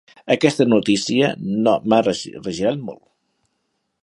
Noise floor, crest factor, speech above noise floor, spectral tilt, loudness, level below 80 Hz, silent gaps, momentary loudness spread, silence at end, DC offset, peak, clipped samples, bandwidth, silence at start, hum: -72 dBFS; 20 dB; 54 dB; -5 dB/octave; -19 LUFS; -58 dBFS; none; 11 LU; 1.05 s; under 0.1%; 0 dBFS; under 0.1%; 11.5 kHz; 0.25 s; none